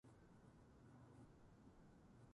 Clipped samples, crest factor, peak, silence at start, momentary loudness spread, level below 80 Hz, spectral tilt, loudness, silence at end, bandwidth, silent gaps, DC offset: under 0.1%; 14 dB; -52 dBFS; 0.05 s; 2 LU; -76 dBFS; -7 dB/octave; -68 LUFS; 0 s; 11 kHz; none; under 0.1%